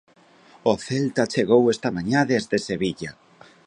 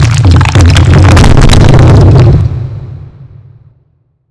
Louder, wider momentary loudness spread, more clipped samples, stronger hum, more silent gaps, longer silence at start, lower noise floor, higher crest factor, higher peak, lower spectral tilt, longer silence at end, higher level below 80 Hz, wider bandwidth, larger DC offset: second, -22 LUFS vs -4 LUFS; second, 8 LU vs 15 LU; second, under 0.1% vs 20%; neither; neither; first, 0.65 s vs 0 s; about the same, -51 dBFS vs -52 dBFS; first, 18 dB vs 4 dB; second, -4 dBFS vs 0 dBFS; about the same, -5.5 dB/octave vs -6.5 dB/octave; second, 0.55 s vs 1.2 s; second, -58 dBFS vs -12 dBFS; about the same, 11 kHz vs 11 kHz; neither